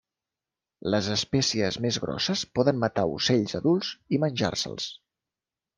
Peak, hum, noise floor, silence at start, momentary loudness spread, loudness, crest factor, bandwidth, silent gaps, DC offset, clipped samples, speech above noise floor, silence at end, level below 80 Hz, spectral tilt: -8 dBFS; none; -90 dBFS; 0.85 s; 5 LU; -26 LUFS; 20 dB; 11 kHz; none; under 0.1%; under 0.1%; 64 dB; 0.85 s; -60 dBFS; -4.5 dB/octave